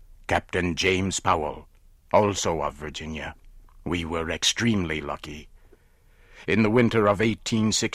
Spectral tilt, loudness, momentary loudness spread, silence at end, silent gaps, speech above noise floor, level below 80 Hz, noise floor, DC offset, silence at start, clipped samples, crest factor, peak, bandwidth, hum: -4 dB/octave; -24 LUFS; 15 LU; 0 s; none; 32 dB; -46 dBFS; -56 dBFS; under 0.1%; 0.1 s; under 0.1%; 20 dB; -6 dBFS; 15 kHz; none